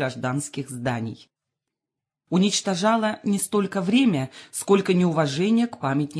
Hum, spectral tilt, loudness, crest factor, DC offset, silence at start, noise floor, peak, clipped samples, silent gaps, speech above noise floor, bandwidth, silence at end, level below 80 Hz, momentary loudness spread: none; -5 dB/octave; -23 LUFS; 18 dB; under 0.1%; 0 s; -87 dBFS; -4 dBFS; under 0.1%; none; 64 dB; 11 kHz; 0 s; -66 dBFS; 9 LU